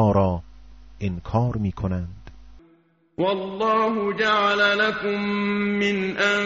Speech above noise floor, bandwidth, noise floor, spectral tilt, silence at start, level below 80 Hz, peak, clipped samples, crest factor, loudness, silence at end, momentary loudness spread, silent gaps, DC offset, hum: 37 dB; 7.6 kHz; -59 dBFS; -4 dB/octave; 0 s; -46 dBFS; -8 dBFS; under 0.1%; 16 dB; -23 LUFS; 0 s; 12 LU; none; under 0.1%; none